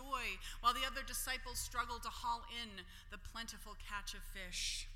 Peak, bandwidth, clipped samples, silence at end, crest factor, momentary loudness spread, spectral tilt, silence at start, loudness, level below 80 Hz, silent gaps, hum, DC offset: -20 dBFS; 16.5 kHz; under 0.1%; 0 s; 22 dB; 13 LU; -1 dB/octave; 0 s; -42 LUFS; -52 dBFS; none; none; under 0.1%